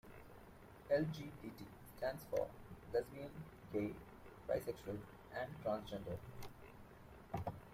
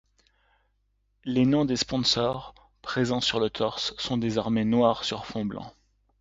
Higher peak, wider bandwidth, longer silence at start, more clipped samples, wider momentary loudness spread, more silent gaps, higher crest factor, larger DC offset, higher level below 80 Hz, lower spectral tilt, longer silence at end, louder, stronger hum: second, -26 dBFS vs -8 dBFS; first, 16 kHz vs 7.8 kHz; second, 0.05 s vs 1.25 s; neither; first, 19 LU vs 13 LU; neither; about the same, 20 dB vs 20 dB; neither; second, -64 dBFS vs -54 dBFS; first, -6.5 dB/octave vs -5 dB/octave; second, 0 s vs 0.5 s; second, -45 LUFS vs -26 LUFS; neither